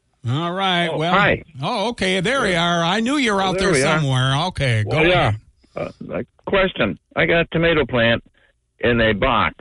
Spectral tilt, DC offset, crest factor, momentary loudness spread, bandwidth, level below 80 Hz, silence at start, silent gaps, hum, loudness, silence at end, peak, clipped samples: -5 dB/octave; under 0.1%; 16 dB; 10 LU; 11.5 kHz; -40 dBFS; 0.25 s; none; none; -18 LUFS; 0.05 s; -2 dBFS; under 0.1%